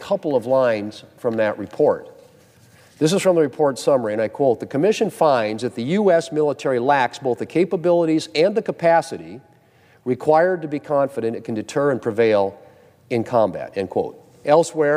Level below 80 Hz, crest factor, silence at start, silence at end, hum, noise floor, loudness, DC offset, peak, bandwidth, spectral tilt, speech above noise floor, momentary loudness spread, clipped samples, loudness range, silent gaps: -66 dBFS; 18 dB; 0 s; 0 s; none; -54 dBFS; -20 LUFS; under 0.1%; -2 dBFS; 15 kHz; -5.5 dB/octave; 35 dB; 9 LU; under 0.1%; 3 LU; none